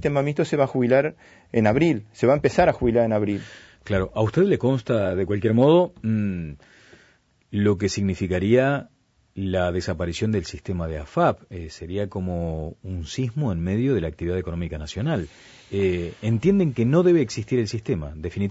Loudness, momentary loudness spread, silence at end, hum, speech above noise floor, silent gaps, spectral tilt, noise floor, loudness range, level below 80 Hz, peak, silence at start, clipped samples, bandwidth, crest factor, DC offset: -23 LUFS; 12 LU; 0 s; none; 38 dB; none; -7 dB/octave; -60 dBFS; 6 LU; -44 dBFS; -6 dBFS; 0 s; under 0.1%; 8 kHz; 16 dB; under 0.1%